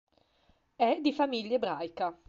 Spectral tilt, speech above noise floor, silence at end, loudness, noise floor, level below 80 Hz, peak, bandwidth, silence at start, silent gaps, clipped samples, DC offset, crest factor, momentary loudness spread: -5.5 dB/octave; 39 dB; 0.15 s; -31 LUFS; -69 dBFS; -74 dBFS; -14 dBFS; 7.6 kHz; 0.8 s; none; under 0.1%; under 0.1%; 18 dB; 7 LU